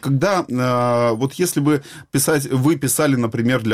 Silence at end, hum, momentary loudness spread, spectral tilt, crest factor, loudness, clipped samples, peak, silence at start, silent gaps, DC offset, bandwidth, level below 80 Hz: 0 s; none; 3 LU; -5.5 dB/octave; 12 dB; -18 LUFS; under 0.1%; -6 dBFS; 0.05 s; none; under 0.1%; 16.5 kHz; -54 dBFS